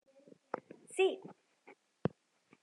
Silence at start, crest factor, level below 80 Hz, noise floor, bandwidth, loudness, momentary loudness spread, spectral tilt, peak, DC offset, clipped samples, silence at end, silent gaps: 0.55 s; 24 dB; -82 dBFS; -70 dBFS; 11.5 kHz; -38 LUFS; 14 LU; -5.5 dB/octave; -18 dBFS; under 0.1%; under 0.1%; 1.3 s; none